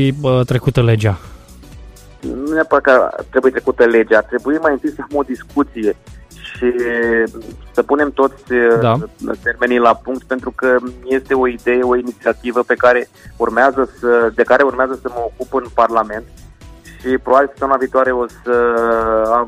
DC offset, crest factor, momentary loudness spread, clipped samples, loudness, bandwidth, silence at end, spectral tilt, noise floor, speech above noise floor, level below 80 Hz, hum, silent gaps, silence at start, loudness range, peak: under 0.1%; 16 dB; 10 LU; under 0.1%; -15 LUFS; 14.5 kHz; 0 s; -7.5 dB/octave; -38 dBFS; 23 dB; -40 dBFS; none; none; 0 s; 3 LU; 0 dBFS